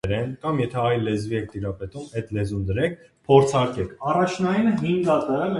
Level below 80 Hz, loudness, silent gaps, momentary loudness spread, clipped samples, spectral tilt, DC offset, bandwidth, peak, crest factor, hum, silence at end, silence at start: -46 dBFS; -23 LUFS; none; 13 LU; under 0.1%; -7 dB/octave; under 0.1%; 11.5 kHz; -4 dBFS; 20 dB; none; 0 s; 0.05 s